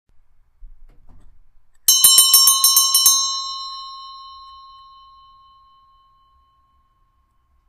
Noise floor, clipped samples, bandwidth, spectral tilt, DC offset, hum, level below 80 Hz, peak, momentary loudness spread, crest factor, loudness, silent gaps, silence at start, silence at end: -62 dBFS; under 0.1%; 15.5 kHz; 4 dB/octave; under 0.1%; none; -52 dBFS; 0 dBFS; 25 LU; 20 dB; -11 LUFS; none; 0.65 s; 3.4 s